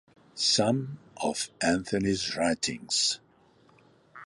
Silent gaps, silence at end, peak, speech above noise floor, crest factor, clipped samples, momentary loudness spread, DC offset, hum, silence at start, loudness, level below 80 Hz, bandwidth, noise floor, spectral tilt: none; 0 s; -12 dBFS; 33 dB; 18 dB; under 0.1%; 9 LU; under 0.1%; none; 0.35 s; -28 LUFS; -58 dBFS; 11.5 kHz; -61 dBFS; -3 dB/octave